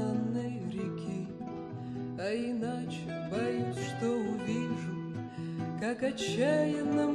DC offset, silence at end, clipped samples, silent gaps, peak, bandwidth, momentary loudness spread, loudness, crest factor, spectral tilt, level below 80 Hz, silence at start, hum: under 0.1%; 0 s; under 0.1%; none; -18 dBFS; 11.5 kHz; 10 LU; -34 LUFS; 16 dB; -6.5 dB/octave; -64 dBFS; 0 s; none